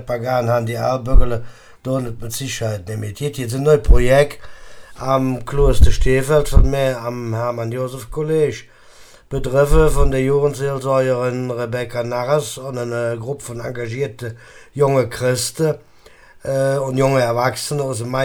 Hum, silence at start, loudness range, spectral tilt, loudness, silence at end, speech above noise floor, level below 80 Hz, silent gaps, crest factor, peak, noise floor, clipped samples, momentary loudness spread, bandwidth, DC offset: none; 0 s; 5 LU; -6 dB/octave; -19 LUFS; 0 s; 29 dB; -22 dBFS; none; 16 dB; 0 dBFS; -45 dBFS; under 0.1%; 11 LU; 17.5 kHz; under 0.1%